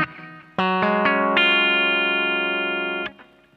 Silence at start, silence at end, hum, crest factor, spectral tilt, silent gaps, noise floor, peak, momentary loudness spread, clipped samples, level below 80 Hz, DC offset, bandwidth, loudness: 0 s; 0.35 s; none; 18 dB; -6 dB/octave; none; -41 dBFS; -4 dBFS; 13 LU; under 0.1%; -66 dBFS; under 0.1%; 7.8 kHz; -19 LUFS